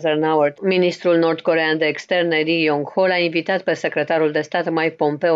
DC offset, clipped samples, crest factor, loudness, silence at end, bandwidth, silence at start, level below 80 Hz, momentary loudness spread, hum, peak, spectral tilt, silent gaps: under 0.1%; under 0.1%; 14 dB; -18 LUFS; 0 s; 7.8 kHz; 0 s; -72 dBFS; 4 LU; none; -6 dBFS; -6 dB/octave; none